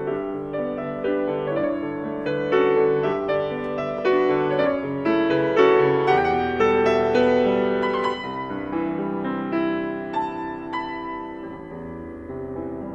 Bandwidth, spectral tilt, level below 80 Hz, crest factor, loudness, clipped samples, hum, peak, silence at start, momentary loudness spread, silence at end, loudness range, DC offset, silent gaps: 7.8 kHz; -7 dB/octave; -54 dBFS; 18 dB; -22 LUFS; under 0.1%; none; -4 dBFS; 0 s; 13 LU; 0 s; 8 LU; under 0.1%; none